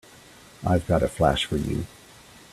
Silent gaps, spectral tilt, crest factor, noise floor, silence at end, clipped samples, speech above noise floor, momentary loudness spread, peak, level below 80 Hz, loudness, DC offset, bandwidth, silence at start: none; -6 dB/octave; 22 dB; -49 dBFS; 0.65 s; under 0.1%; 26 dB; 10 LU; -6 dBFS; -42 dBFS; -25 LUFS; under 0.1%; 14.5 kHz; 0.6 s